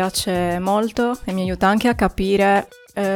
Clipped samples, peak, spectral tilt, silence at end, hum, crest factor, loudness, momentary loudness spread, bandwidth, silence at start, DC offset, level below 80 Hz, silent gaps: under 0.1%; -4 dBFS; -5 dB/octave; 0 s; none; 16 dB; -19 LUFS; 7 LU; 17.5 kHz; 0 s; under 0.1%; -38 dBFS; none